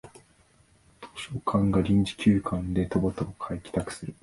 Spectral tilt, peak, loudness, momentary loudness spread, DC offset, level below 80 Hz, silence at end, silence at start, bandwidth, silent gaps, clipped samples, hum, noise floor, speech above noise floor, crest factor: -7 dB/octave; -10 dBFS; -27 LUFS; 13 LU; under 0.1%; -46 dBFS; 0.1 s; 0.05 s; 11.5 kHz; none; under 0.1%; none; -61 dBFS; 35 dB; 18 dB